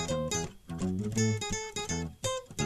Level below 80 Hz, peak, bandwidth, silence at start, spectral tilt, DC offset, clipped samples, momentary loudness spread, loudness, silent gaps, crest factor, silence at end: -50 dBFS; -18 dBFS; 14 kHz; 0 s; -4.5 dB/octave; under 0.1%; under 0.1%; 5 LU; -33 LUFS; none; 16 dB; 0 s